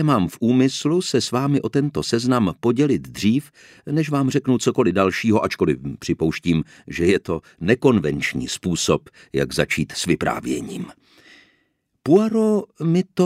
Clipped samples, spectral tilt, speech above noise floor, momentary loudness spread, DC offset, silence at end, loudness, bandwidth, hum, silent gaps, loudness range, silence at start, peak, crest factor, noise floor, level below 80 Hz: under 0.1%; -5.5 dB/octave; 48 dB; 8 LU; under 0.1%; 0 s; -20 LUFS; 15.5 kHz; none; none; 3 LU; 0 s; -2 dBFS; 18 dB; -68 dBFS; -48 dBFS